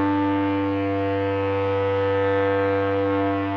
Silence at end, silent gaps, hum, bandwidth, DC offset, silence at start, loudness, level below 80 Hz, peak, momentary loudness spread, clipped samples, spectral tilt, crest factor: 0 s; none; none; 5.8 kHz; under 0.1%; 0 s; -22 LUFS; -62 dBFS; -10 dBFS; 2 LU; under 0.1%; -9 dB/octave; 10 dB